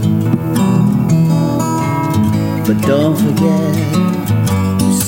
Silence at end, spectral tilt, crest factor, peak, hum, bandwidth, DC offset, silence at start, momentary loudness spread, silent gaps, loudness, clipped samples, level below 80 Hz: 0 s; -6.5 dB/octave; 12 dB; 0 dBFS; none; 16.5 kHz; under 0.1%; 0 s; 3 LU; none; -14 LUFS; under 0.1%; -42 dBFS